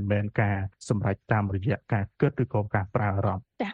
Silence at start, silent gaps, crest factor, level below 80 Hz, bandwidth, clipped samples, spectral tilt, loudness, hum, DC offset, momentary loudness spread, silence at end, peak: 0 s; none; 18 dB; -54 dBFS; 8.4 kHz; under 0.1%; -8 dB/octave; -28 LUFS; none; under 0.1%; 4 LU; 0 s; -10 dBFS